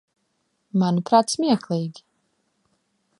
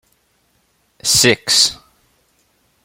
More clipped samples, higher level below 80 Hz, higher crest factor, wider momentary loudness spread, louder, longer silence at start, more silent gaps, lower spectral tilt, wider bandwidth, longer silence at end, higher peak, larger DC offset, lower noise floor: neither; second, -72 dBFS vs -52 dBFS; about the same, 22 dB vs 20 dB; first, 9 LU vs 5 LU; second, -22 LUFS vs -13 LUFS; second, 0.75 s vs 1.05 s; neither; first, -6 dB/octave vs -1.5 dB/octave; second, 11.5 kHz vs 16.5 kHz; first, 1.3 s vs 1.1 s; second, -4 dBFS vs 0 dBFS; neither; first, -72 dBFS vs -61 dBFS